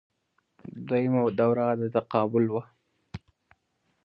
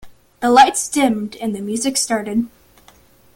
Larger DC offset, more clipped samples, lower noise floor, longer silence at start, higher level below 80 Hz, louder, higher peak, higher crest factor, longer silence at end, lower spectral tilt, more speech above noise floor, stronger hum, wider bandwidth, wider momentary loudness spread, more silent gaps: neither; neither; first, -74 dBFS vs -50 dBFS; first, 0.65 s vs 0.05 s; second, -64 dBFS vs -54 dBFS; second, -26 LUFS vs -17 LUFS; second, -10 dBFS vs 0 dBFS; about the same, 20 dB vs 18 dB; about the same, 0.85 s vs 0.9 s; first, -10.5 dB/octave vs -3 dB/octave; first, 49 dB vs 33 dB; neither; second, 5.4 kHz vs 17 kHz; first, 21 LU vs 12 LU; neither